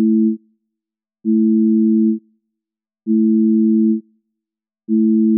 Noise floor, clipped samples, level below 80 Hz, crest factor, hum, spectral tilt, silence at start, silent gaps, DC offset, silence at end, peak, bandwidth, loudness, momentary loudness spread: -86 dBFS; under 0.1%; -88 dBFS; 8 dB; none; -21 dB/octave; 0 s; none; under 0.1%; 0 s; -8 dBFS; 0.4 kHz; -16 LUFS; 11 LU